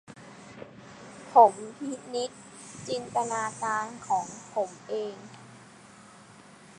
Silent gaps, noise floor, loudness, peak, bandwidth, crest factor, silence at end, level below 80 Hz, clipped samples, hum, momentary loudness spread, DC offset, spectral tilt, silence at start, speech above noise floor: none; -52 dBFS; -28 LUFS; -4 dBFS; 11 kHz; 26 dB; 1.2 s; -74 dBFS; under 0.1%; none; 26 LU; under 0.1%; -3.5 dB/octave; 0.1 s; 24 dB